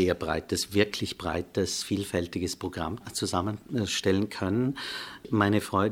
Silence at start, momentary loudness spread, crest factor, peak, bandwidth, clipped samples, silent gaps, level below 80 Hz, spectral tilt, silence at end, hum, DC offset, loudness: 0 s; 7 LU; 20 dB; -8 dBFS; 17 kHz; under 0.1%; none; -54 dBFS; -4.5 dB/octave; 0 s; none; under 0.1%; -29 LUFS